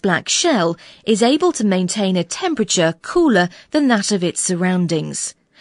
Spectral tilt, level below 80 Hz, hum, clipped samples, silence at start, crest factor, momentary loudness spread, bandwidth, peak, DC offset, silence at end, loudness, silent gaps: -4 dB/octave; -54 dBFS; none; under 0.1%; 0.05 s; 16 dB; 6 LU; 11 kHz; -2 dBFS; under 0.1%; 0.3 s; -17 LUFS; none